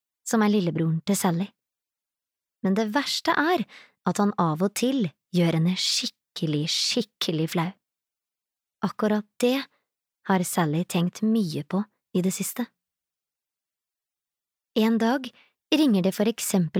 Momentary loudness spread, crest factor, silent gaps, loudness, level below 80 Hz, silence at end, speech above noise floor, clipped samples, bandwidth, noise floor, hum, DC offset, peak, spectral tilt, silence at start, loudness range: 9 LU; 16 dB; none; -25 LUFS; -74 dBFS; 0 s; 66 dB; under 0.1%; 17.5 kHz; -90 dBFS; none; under 0.1%; -10 dBFS; -5 dB/octave; 0.25 s; 5 LU